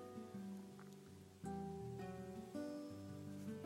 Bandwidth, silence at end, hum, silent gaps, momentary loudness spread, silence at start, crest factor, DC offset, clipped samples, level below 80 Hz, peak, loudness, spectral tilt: 16 kHz; 0 s; none; none; 9 LU; 0 s; 14 dB; under 0.1%; under 0.1%; -74 dBFS; -36 dBFS; -52 LUFS; -7 dB/octave